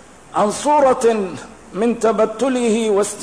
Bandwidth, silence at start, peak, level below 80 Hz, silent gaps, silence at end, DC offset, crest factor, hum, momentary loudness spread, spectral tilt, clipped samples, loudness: 11 kHz; 0.3 s; -6 dBFS; -54 dBFS; none; 0 s; 0.3%; 12 dB; none; 11 LU; -4.5 dB/octave; under 0.1%; -17 LUFS